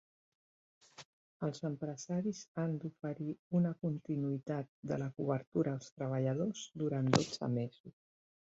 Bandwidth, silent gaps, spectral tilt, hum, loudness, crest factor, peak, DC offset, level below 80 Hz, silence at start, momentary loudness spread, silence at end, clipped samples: 8 kHz; 1.05-1.40 s, 2.48-2.55 s, 3.39-3.51 s, 4.69-4.83 s, 5.47-5.52 s, 5.92-5.97 s, 7.80-7.84 s; -7 dB/octave; none; -38 LUFS; 28 dB; -10 dBFS; under 0.1%; -72 dBFS; 1 s; 9 LU; 0.55 s; under 0.1%